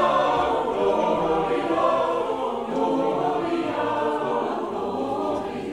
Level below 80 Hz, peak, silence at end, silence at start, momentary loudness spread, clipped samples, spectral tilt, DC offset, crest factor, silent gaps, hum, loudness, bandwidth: -54 dBFS; -8 dBFS; 0 s; 0 s; 6 LU; under 0.1%; -6 dB/octave; 0.1%; 16 dB; none; none; -24 LUFS; 12 kHz